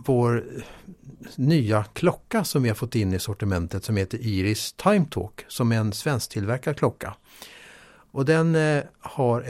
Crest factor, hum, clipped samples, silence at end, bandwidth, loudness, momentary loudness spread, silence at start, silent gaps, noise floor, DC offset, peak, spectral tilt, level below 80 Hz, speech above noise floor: 18 dB; none; under 0.1%; 0 s; 16 kHz; -24 LUFS; 17 LU; 0 s; none; -50 dBFS; under 0.1%; -6 dBFS; -6 dB/octave; -54 dBFS; 26 dB